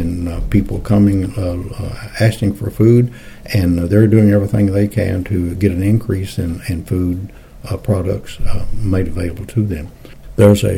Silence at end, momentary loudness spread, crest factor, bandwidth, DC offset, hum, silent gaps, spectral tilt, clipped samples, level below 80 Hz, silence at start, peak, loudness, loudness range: 0 s; 14 LU; 14 dB; 16 kHz; under 0.1%; none; none; -8 dB/octave; under 0.1%; -30 dBFS; 0 s; 0 dBFS; -16 LUFS; 7 LU